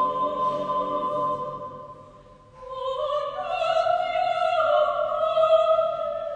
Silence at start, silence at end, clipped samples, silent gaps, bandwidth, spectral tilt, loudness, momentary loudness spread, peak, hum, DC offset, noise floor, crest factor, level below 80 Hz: 0 s; 0 s; under 0.1%; none; 9 kHz; -5 dB/octave; -24 LUFS; 14 LU; -8 dBFS; none; under 0.1%; -49 dBFS; 16 dB; -58 dBFS